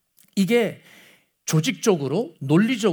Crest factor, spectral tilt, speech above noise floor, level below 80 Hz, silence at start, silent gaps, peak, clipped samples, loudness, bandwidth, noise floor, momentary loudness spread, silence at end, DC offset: 18 dB; -5.5 dB/octave; 34 dB; -74 dBFS; 0.35 s; none; -6 dBFS; under 0.1%; -22 LUFS; over 20 kHz; -54 dBFS; 8 LU; 0 s; under 0.1%